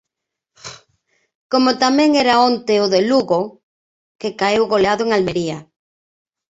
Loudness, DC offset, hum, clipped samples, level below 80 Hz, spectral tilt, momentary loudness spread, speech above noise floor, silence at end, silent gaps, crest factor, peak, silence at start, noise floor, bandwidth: -16 LUFS; under 0.1%; none; under 0.1%; -56 dBFS; -4.5 dB/octave; 18 LU; 66 dB; 0.9 s; 1.35-1.50 s, 3.63-4.19 s; 16 dB; -2 dBFS; 0.65 s; -81 dBFS; 8 kHz